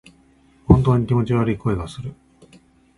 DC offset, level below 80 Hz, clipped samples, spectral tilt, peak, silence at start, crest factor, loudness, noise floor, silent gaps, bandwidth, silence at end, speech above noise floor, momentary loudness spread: under 0.1%; -34 dBFS; under 0.1%; -9 dB/octave; 0 dBFS; 0.7 s; 20 dB; -19 LUFS; -55 dBFS; none; 11 kHz; 0.85 s; 36 dB; 20 LU